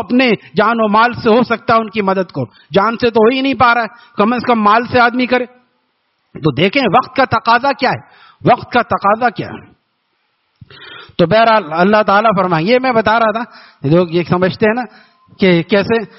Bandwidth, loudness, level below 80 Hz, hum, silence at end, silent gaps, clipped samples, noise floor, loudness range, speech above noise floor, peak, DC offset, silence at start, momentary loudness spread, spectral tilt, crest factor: 6 kHz; -13 LUFS; -50 dBFS; none; 0.1 s; none; under 0.1%; -64 dBFS; 3 LU; 51 dB; 0 dBFS; under 0.1%; 0 s; 11 LU; -4 dB/octave; 14 dB